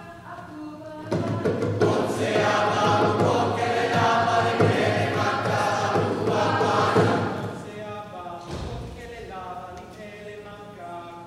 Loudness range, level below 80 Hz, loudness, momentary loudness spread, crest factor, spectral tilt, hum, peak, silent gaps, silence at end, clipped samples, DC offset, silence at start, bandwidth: 14 LU; -52 dBFS; -23 LUFS; 19 LU; 16 dB; -5.5 dB/octave; none; -8 dBFS; none; 0 s; under 0.1%; under 0.1%; 0 s; 14.5 kHz